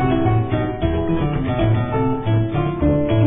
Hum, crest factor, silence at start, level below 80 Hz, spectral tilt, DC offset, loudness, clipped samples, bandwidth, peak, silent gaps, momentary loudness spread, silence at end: none; 14 dB; 0 s; -30 dBFS; -12.5 dB/octave; 0.4%; -19 LUFS; under 0.1%; 3.8 kHz; -4 dBFS; none; 3 LU; 0 s